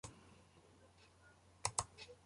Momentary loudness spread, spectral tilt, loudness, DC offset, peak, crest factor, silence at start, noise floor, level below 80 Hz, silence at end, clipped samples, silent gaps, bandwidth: 26 LU; -1.5 dB/octave; -44 LUFS; under 0.1%; -18 dBFS; 32 dB; 0.05 s; -67 dBFS; -68 dBFS; 0.05 s; under 0.1%; none; 11.5 kHz